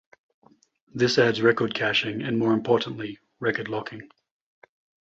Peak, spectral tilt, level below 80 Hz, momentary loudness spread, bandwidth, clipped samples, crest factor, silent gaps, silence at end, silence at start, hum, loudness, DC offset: -6 dBFS; -5.5 dB/octave; -64 dBFS; 16 LU; 7.8 kHz; under 0.1%; 20 dB; none; 1 s; 0.95 s; none; -24 LUFS; under 0.1%